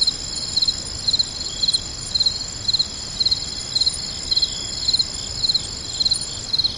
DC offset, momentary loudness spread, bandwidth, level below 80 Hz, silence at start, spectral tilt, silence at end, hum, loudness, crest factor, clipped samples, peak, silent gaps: under 0.1%; 4 LU; 11.5 kHz; -42 dBFS; 0 s; -0.5 dB/octave; 0 s; none; -20 LUFS; 16 dB; under 0.1%; -8 dBFS; none